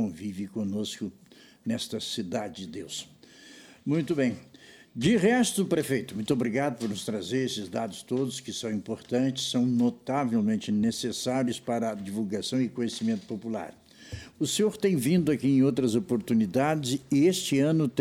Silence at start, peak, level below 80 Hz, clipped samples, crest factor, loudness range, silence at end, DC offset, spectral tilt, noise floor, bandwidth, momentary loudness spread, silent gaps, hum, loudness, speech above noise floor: 0 s; -12 dBFS; -64 dBFS; under 0.1%; 16 dB; 7 LU; 0 s; under 0.1%; -5 dB/octave; -51 dBFS; 19 kHz; 13 LU; none; none; -28 LUFS; 24 dB